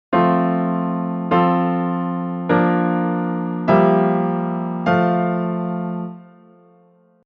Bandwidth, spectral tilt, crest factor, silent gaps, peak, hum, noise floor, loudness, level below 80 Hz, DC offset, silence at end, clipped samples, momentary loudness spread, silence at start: 5 kHz; -10 dB/octave; 18 dB; none; -2 dBFS; none; -54 dBFS; -19 LUFS; -58 dBFS; under 0.1%; 1.05 s; under 0.1%; 8 LU; 0.1 s